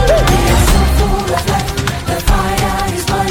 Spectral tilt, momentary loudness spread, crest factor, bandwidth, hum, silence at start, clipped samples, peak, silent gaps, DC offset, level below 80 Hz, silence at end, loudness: -4.5 dB/octave; 6 LU; 12 dB; 18 kHz; none; 0 s; under 0.1%; -2 dBFS; none; under 0.1%; -16 dBFS; 0 s; -14 LUFS